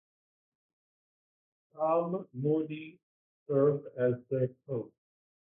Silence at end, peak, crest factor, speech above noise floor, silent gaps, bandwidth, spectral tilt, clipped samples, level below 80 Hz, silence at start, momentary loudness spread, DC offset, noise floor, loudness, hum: 0.6 s; -14 dBFS; 20 dB; over 59 dB; 3.03-3.46 s; 3.8 kHz; -12 dB/octave; under 0.1%; -78 dBFS; 1.75 s; 12 LU; under 0.1%; under -90 dBFS; -32 LUFS; none